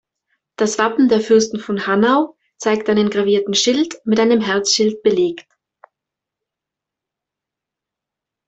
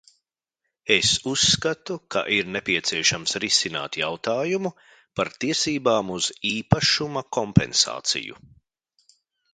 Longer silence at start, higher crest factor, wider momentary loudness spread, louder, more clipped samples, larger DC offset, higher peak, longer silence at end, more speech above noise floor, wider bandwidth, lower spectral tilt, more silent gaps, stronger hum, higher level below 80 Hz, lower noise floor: second, 0.6 s vs 0.85 s; second, 16 dB vs 24 dB; about the same, 7 LU vs 9 LU; first, -16 LUFS vs -22 LUFS; neither; neither; about the same, -2 dBFS vs 0 dBFS; first, 3.05 s vs 1.2 s; first, 69 dB vs 57 dB; second, 8.4 kHz vs 9.6 kHz; about the same, -3.5 dB/octave vs -3 dB/octave; neither; neither; second, -62 dBFS vs -50 dBFS; about the same, -84 dBFS vs -81 dBFS